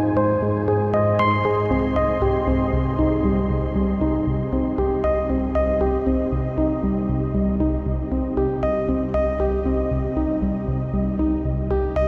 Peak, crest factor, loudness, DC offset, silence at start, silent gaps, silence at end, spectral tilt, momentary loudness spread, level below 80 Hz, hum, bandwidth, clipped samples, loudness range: -8 dBFS; 12 dB; -22 LUFS; under 0.1%; 0 s; none; 0 s; -10.5 dB/octave; 4 LU; -28 dBFS; none; 4.5 kHz; under 0.1%; 2 LU